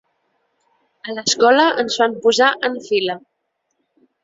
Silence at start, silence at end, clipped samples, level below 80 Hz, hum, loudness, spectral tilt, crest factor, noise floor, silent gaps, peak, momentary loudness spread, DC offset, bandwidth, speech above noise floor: 1.05 s; 1.05 s; under 0.1%; -66 dBFS; none; -16 LUFS; -2 dB/octave; 18 dB; -72 dBFS; none; -2 dBFS; 15 LU; under 0.1%; 7.8 kHz; 56 dB